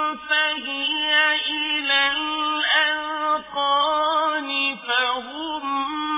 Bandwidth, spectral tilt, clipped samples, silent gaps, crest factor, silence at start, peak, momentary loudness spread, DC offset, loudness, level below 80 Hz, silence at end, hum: 3.9 kHz; -4.5 dB/octave; under 0.1%; none; 16 dB; 0 s; -6 dBFS; 7 LU; under 0.1%; -21 LUFS; -62 dBFS; 0 s; none